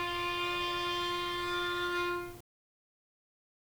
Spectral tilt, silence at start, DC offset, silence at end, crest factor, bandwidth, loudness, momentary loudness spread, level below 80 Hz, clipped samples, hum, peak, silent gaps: -3 dB/octave; 0 s; under 0.1%; 1.3 s; 16 dB; over 20 kHz; -33 LUFS; 3 LU; -58 dBFS; under 0.1%; none; -22 dBFS; none